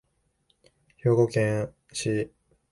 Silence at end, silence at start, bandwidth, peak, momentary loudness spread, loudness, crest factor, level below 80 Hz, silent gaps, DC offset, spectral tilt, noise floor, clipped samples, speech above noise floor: 0.45 s; 1.05 s; 11.5 kHz; -8 dBFS; 11 LU; -27 LUFS; 20 dB; -60 dBFS; none; under 0.1%; -6 dB/octave; -70 dBFS; under 0.1%; 46 dB